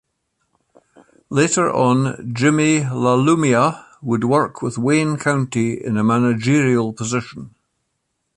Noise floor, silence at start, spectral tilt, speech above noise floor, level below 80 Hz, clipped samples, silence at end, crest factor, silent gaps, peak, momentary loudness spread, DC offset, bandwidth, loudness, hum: -73 dBFS; 1.3 s; -5.5 dB/octave; 56 dB; -56 dBFS; under 0.1%; 0.9 s; 16 dB; none; -2 dBFS; 8 LU; under 0.1%; 11.5 kHz; -18 LUFS; none